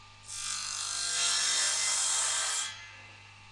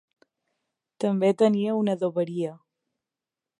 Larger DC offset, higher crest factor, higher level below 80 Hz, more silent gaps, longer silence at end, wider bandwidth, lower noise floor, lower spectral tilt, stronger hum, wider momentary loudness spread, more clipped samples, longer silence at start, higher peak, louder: neither; about the same, 16 dB vs 18 dB; first, -66 dBFS vs -78 dBFS; neither; second, 0 s vs 1.05 s; about the same, 11.5 kHz vs 11 kHz; second, -52 dBFS vs -89 dBFS; second, 2.5 dB/octave vs -7.5 dB/octave; first, 50 Hz at -65 dBFS vs none; first, 16 LU vs 10 LU; neither; second, 0 s vs 1 s; second, -16 dBFS vs -8 dBFS; second, -28 LUFS vs -25 LUFS